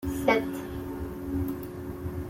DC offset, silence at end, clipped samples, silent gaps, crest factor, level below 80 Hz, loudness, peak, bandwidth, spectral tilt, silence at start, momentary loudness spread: under 0.1%; 0 s; under 0.1%; none; 22 dB; -46 dBFS; -31 LUFS; -8 dBFS; 16.5 kHz; -6.5 dB/octave; 0 s; 11 LU